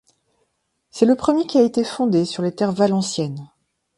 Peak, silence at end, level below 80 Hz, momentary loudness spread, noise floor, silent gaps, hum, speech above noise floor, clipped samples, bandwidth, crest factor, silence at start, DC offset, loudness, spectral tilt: -2 dBFS; 0.55 s; -58 dBFS; 10 LU; -71 dBFS; none; none; 52 dB; under 0.1%; 11.5 kHz; 20 dB; 0.95 s; under 0.1%; -19 LUFS; -6 dB/octave